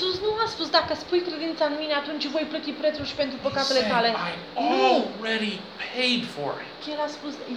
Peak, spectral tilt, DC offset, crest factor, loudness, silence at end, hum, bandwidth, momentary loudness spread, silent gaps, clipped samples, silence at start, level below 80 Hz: -6 dBFS; -4 dB/octave; under 0.1%; 20 dB; -25 LUFS; 0 s; none; 12.5 kHz; 10 LU; none; under 0.1%; 0 s; -60 dBFS